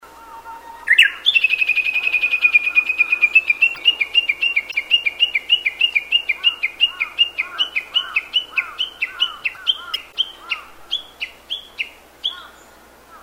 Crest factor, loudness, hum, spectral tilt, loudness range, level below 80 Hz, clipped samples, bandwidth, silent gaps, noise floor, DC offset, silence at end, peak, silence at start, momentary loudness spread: 18 dB; -16 LUFS; none; 1 dB/octave; 9 LU; -58 dBFS; under 0.1%; 16 kHz; none; -46 dBFS; under 0.1%; 0.05 s; -2 dBFS; 0.05 s; 14 LU